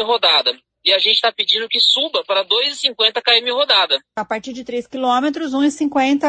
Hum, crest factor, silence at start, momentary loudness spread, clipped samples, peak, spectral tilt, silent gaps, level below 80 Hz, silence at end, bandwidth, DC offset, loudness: none; 16 dB; 0 s; 12 LU; under 0.1%; 0 dBFS; -1.5 dB/octave; none; -66 dBFS; 0 s; 9.4 kHz; under 0.1%; -15 LUFS